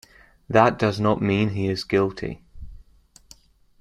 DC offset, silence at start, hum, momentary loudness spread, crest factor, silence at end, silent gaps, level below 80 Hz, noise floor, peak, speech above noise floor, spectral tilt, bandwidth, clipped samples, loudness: under 0.1%; 0.5 s; none; 14 LU; 22 dB; 1.05 s; none; -48 dBFS; -55 dBFS; -2 dBFS; 33 dB; -7 dB/octave; 12 kHz; under 0.1%; -22 LUFS